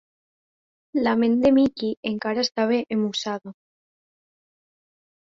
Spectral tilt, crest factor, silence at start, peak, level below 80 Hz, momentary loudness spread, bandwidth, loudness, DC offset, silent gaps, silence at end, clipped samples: -5 dB/octave; 18 dB; 0.95 s; -8 dBFS; -62 dBFS; 10 LU; 7.6 kHz; -23 LUFS; under 0.1%; 1.97-2.03 s; 1.9 s; under 0.1%